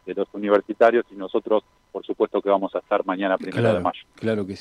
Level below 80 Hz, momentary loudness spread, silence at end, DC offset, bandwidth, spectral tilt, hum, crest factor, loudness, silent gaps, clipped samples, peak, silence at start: -64 dBFS; 10 LU; 0 s; under 0.1%; 10.5 kHz; -7.5 dB/octave; none; 18 dB; -23 LUFS; none; under 0.1%; -6 dBFS; 0.05 s